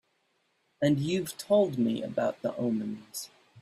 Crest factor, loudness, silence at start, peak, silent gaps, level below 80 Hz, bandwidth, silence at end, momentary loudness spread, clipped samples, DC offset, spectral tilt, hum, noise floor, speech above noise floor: 16 dB; -29 LUFS; 0.8 s; -14 dBFS; none; -68 dBFS; 15.5 kHz; 0 s; 13 LU; under 0.1%; under 0.1%; -6 dB/octave; none; -74 dBFS; 45 dB